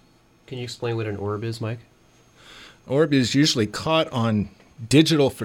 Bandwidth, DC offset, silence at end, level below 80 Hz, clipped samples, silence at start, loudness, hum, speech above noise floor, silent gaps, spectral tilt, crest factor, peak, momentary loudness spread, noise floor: 16.5 kHz; under 0.1%; 0 s; -54 dBFS; under 0.1%; 0.5 s; -22 LUFS; none; 33 dB; none; -5 dB/octave; 20 dB; -4 dBFS; 16 LU; -55 dBFS